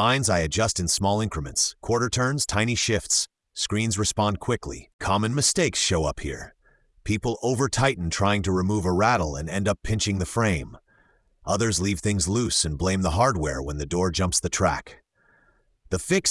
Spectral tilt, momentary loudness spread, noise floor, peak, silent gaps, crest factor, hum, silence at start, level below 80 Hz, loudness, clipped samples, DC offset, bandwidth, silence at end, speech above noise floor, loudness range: -4 dB/octave; 9 LU; -63 dBFS; -6 dBFS; 4.93-4.99 s; 18 dB; none; 0 s; -42 dBFS; -24 LUFS; under 0.1%; under 0.1%; 12 kHz; 0 s; 39 dB; 2 LU